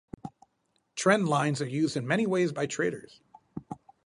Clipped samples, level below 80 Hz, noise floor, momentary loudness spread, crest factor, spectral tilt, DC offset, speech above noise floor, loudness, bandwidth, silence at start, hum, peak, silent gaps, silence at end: under 0.1%; -66 dBFS; -75 dBFS; 21 LU; 22 dB; -5.5 dB/octave; under 0.1%; 47 dB; -28 LUFS; 11.5 kHz; 0.25 s; none; -8 dBFS; none; 0.3 s